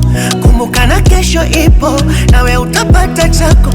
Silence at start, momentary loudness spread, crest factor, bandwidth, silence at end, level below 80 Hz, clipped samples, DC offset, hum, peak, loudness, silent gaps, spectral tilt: 0 s; 2 LU; 8 dB; 16.5 kHz; 0 s; -10 dBFS; 0.6%; under 0.1%; none; 0 dBFS; -9 LUFS; none; -5 dB/octave